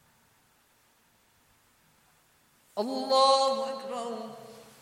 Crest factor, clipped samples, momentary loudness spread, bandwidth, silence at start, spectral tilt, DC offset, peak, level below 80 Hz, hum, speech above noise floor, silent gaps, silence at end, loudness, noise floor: 22 dB; under 0.1%; 22 LU; 15.5 kHz; 2.75 s; -2.5 dB/octave; under 0.1%; -10 dBFS; -82 dBFS; none; 39 dB; none; 0.2 s; -28 LUFS; -66 dBFS